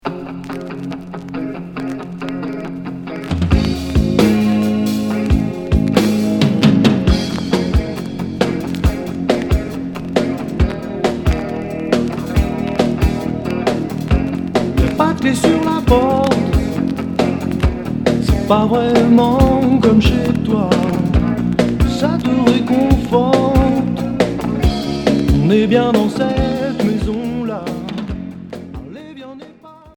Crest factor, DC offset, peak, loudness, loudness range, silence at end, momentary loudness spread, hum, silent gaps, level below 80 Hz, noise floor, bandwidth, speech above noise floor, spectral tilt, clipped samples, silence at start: 16 dB; under 0.1%; 0 dBFS; -16 LUFS; 6 LU; 0.05 s; 13 LU; none; none; -24 dBFS; -40 dBFS; 18.5 kHz; 29 dB; -7 dB/octave; under 0.1%; 0.05 s